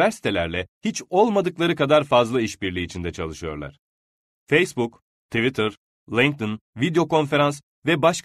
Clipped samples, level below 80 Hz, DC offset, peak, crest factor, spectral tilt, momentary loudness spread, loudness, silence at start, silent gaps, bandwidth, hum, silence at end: under 0.1%; -50 dBFS; under 0.1%; -4 dBFS; 18 dB; -5 dB/octave; 11 LU; -22 LUFS; 0 s; 0.68-0.81 s, 3.79-4.47 s, 5.02-5.29 s, 5.77-6.07 s, 6.61-6.73 s, 7.63-7.82 s; 13.5 kHz; none; 0.05 s